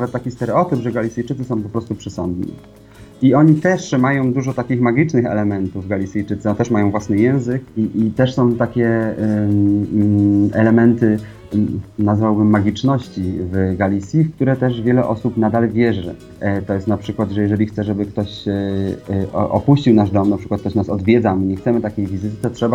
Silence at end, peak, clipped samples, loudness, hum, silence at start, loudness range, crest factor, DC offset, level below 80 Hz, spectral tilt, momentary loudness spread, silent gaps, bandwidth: 0 s; 0 dBFS; under 0.1%; -17 LUFS; none; 0 s; 4 LU; 16 dB; under 0.1%; -46 dBFS; -8 dB/octave; 9 LU; none; 10 kHz